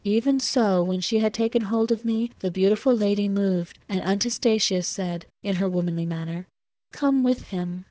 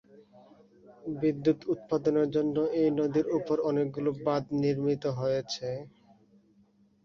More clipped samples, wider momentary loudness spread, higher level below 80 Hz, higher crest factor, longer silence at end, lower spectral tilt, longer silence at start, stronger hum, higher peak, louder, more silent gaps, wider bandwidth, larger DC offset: neither; about the same, 8 LU vs 8 LU; first, -58 dBFS vs -66 dBFS; about the same, 14 dB vs 16 dB; second, 0.1 s vs 1.15 s; second, -5.5 dB/octave vs -7.5 dB/octave; second, 0.05 s vs 0.9 s; neither; first, -10 dBFS vs -14 dBFS; first, -24 LUFS vs -29 LUFS; neither; first, 8 kHz vs 7.2 kHz; neither